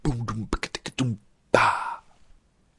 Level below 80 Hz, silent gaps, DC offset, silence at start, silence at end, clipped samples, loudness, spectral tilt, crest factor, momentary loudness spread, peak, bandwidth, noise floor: -42 dBFS; none; under 0.1%; 0.05 s; 0.8 s; under 0.1%; -26 LUFS; -5 dB/octave; 26 dB; 14 LU; -2 dBFS; 11.5 kHz; -57 dBFS